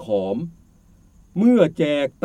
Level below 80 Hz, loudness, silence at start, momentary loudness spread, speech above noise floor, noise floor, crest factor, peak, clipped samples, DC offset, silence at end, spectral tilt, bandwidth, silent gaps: -56 dBFS; -19 LUFS; 0 s; 15 LU; 34 dB; -53 dBFS; 18 dB; -2 dBFS; under 0.1%; under 0.1%; 0.15 s; -7.5 dB/octave; 9.4 kHz; none